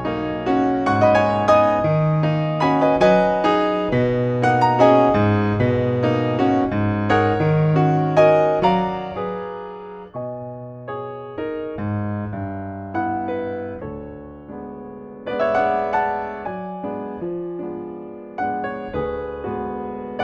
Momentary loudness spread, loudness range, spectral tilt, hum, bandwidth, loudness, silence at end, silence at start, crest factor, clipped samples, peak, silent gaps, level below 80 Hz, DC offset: 17 LU; 11 LU; -8 dB/octave; none; 8.4 kHz; -20 LUFS; 0 s; 0 s; 18 dB; under 0.1%; -2 dBFS; none; -46 dBFS; under 0.1%